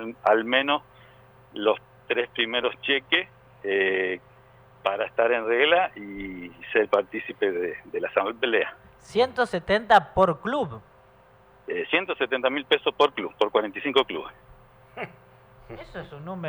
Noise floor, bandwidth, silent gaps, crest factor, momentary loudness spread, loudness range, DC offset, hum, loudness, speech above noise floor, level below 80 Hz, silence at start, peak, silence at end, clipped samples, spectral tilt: -55 dBFS; 19.5 kHz; none; 20 dB; 17 LU; 3 LU; under 0.1%; none; -24 LUFS; 30 dB; -56 dBFS; 0 s; -6 dBFS; 0 s; under 0.1%; -5 dB/octave